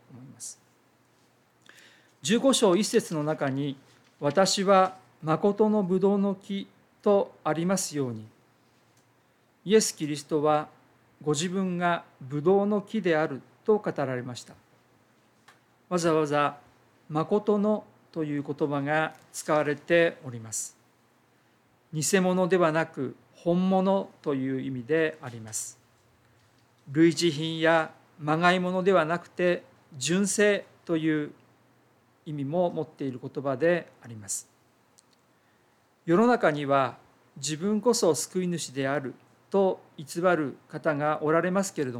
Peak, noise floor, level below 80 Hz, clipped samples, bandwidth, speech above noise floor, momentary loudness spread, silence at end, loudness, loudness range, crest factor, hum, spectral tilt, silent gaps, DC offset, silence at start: -8 dBFS; -65 dBFS; -78 dBFS; under 0.1%; 16 kHz; 39 dB; 13 LU; 0 s; -27 LUFS; 5 LU; 20 dB; none; -5 dB/octave; none; under 0.1%; 0.1 s